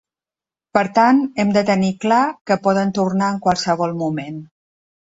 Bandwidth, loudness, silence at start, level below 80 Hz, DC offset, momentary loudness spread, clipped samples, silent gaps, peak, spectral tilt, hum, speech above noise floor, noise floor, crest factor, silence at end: 8 kHz; -18 LUFS; 0.75 s; -56 dBFS; under 0.1%; 9 LU; under 0.1%; 2.41-2.45 s; -2 dBFS; -6 dB/octave; none; over 73 dB; under -90 dBFS; 18 dB; 0.7 s